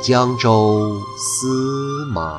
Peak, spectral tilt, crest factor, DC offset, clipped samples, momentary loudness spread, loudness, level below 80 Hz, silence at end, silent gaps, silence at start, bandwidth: -2 dBFS; -5 dB/octave; 16 dB; under 0.1%; under 0.1%; 9 LU; -18 LUFS; -46 dBFS; 0 s; none; 0 s; 13.5 kHz